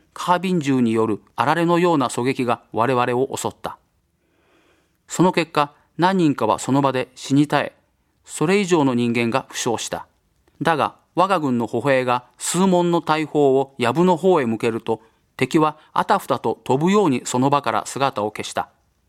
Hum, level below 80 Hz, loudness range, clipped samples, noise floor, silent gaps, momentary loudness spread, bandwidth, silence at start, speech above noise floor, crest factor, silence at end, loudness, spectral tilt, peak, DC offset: none; -62 dBFS; 4 LU; under 0.1%; -65 dBFS; none; 8 LU; 15.5 kHz; 0.2 s; 46 dB; 20 dB; 0.45 s; -20 LUFS; -5.5 dB/octave; 0 dBFS; under 0.1%